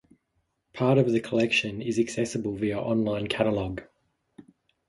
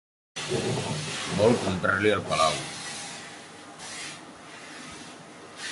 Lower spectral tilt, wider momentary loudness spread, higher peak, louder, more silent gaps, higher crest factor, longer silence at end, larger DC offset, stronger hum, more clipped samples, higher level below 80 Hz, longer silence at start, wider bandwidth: first, -5.5 dB/octave vs -4 dB/octave; second, 7 LU vs 20 LU; about the same, -8 dBFS vs -10 dBFS; about the same, -26 LUFS vs -27 LUFS; neither; about the same, 18 dB vs 20 dB; first, 0.5 s vs 0 s; neither; neither; neither; about the same, -56 dBFS vs -56 dBFS; first, 0.75 s vs 0.35 s; about the same, 11.5 kHz vs 11.5 kHz